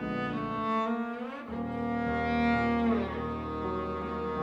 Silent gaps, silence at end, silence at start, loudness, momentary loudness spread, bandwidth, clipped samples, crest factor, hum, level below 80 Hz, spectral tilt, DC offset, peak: none; 0 s; 0 s; -31 LUFS; 9 LU; 7.4 kHz; under 0.1%; 14 dB; none; -48 dBFS; -8 dB/octave; under 0.1%; -16 dBFS